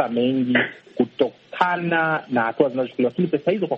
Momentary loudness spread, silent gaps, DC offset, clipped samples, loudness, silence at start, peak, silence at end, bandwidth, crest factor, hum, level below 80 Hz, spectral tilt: 5 LU; none; under 0.1%; under 0.1%; -22 LUFS; 0 s; -2 dBFS; 0 s; 6 kHz; 18 dB; none; -66 dBFS; -8 dB/octave